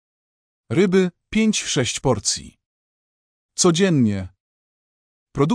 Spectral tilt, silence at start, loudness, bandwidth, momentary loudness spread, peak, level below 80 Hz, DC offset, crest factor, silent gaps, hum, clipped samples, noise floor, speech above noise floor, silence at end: -4.5 dB/octave; 0.7 s; -20 LUFS; 10.5 kHz; 12 LU; -6 dBFS; -50 dBFS; under 0.1%; 16 dB; 2.66-3.49 s, 4.40-5.27 s; none; under 0.1%; under -90 dBFS; over 71 dB; 0 s